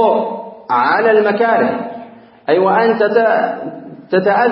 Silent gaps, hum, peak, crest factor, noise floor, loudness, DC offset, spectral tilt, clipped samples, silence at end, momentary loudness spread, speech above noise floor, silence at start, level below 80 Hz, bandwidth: none; none; 0 dBFS; 14 dB; -37 dBFS; -14 LUFS; under 0.1%; -11 dB/octave; under 0.1%; 0 s; 16 LU; 24 dB; 0 s; -68 dBFS; 5.8 kHz